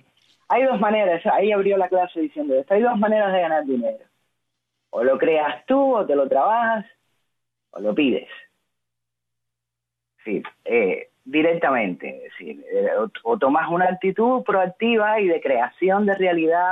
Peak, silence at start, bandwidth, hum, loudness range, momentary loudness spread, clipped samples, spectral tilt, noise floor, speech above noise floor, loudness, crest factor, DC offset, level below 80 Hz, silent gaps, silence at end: -8 dBFS; 0.5 s; 4 kHz; 60 Hz at -65 dBFS; 8 LU; 10 LU; under 0.1%; -8.5 dB/octave; -84 dBFS; 64 dB; -20 LUFS; 14 dB; under 0.1%; -70 dBFS; none; 0 s